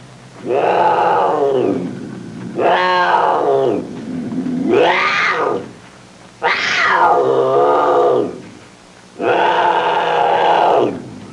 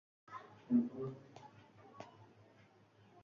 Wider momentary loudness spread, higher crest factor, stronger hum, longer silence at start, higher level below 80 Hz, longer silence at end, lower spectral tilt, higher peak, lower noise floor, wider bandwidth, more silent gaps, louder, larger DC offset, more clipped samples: second, 13 LU vs 26 LU; second, 12 dB vs 22 dB; neither; second, 0 s vs 0.3 s; first, -60 dBFS vs -82 dBFS; second, 0 s vs 1 s; second, -5 dB/octave vs -8 dB/octave; first, -2 dBFS vs -22 dBFS; second, -42 dBFS vs -67 dBFS; first, 11 kHz vs 6.8 kHz; neither; first, -15 LUFS vs -39 LUFS; neither; neither